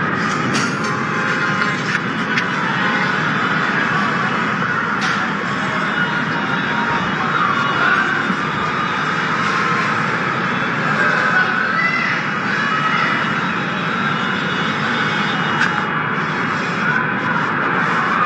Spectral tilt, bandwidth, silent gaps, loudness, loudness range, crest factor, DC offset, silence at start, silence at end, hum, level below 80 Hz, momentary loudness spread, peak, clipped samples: -4.5 dB/octave; 10.5 kHz; none; -17 LUFS; 1 LU; 16 dB; under 0.1%; 0 s; 0 s; none; -54 dBFS; 3 LU; -2 dBFS; under 0.1%